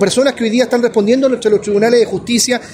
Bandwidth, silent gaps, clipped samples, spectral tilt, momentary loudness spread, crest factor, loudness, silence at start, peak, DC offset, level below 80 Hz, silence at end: 16 kHz; none; under 0.1%; -4 dB/octave; 2 LU; 12 dB; -13 LUFS; 0 s; 0 dBFS; under 0.1%; -52 dBFS; 0 s